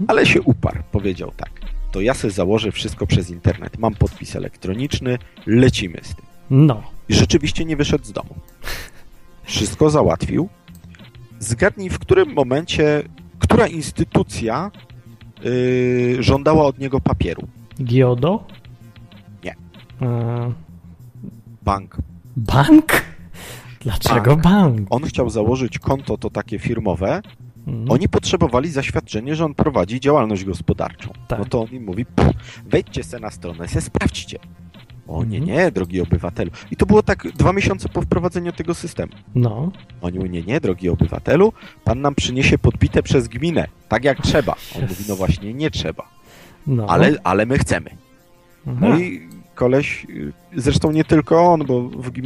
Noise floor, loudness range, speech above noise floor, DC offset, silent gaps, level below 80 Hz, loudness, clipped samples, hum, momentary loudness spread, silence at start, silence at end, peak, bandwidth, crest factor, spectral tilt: -50 dBFS; 5 LU; 32 dB; under 0.1%; none; -34 dBFS; -18 LUFS; under 0.1%; none; 16 LU; 0 s; 0 s; 0 dBFS; 15.5 kHz; 18 dB; -6 dB/octave